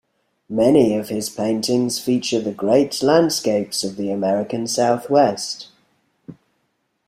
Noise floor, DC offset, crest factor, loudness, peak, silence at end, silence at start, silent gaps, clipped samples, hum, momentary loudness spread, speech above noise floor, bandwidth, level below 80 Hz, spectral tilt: -70 dBFS; under 0.1%; 18 dB; -19 LUFS; -2 dBFS; 0.75 s; 0.5 s; none; under 0.1%; none; 8 LU; 51 dB; 16 kHz; -60 dBFS; -4.5 dB/octave